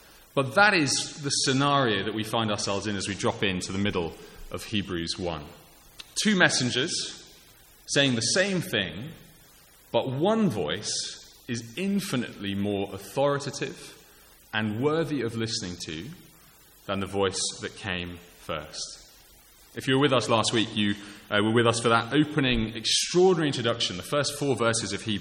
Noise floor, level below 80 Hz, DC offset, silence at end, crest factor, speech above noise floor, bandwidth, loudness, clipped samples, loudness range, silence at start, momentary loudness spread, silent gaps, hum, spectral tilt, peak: -55 dBFS; -54 dBFS; under 0.1%; 0 s; 22 dB; 28 dB; 17 kHz; -26 LUFS; under 0.1%; 7 LU; 0.35 s; 14 LU; none; none; -3.5 dB/octave; -4 dBFS